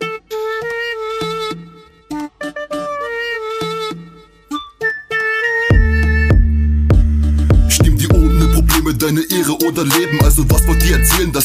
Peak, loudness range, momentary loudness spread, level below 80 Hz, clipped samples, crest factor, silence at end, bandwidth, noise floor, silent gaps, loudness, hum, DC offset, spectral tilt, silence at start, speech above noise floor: 0 dBFS; 10 LU; 13 LU; -18 dBFS; under 0.1%; 14 dB; 0 s; 16 kHz; -40 dBFS; none; -15 LUFS; none; under 0.1%; -4.5 dB/octave; 0 s; 27 dB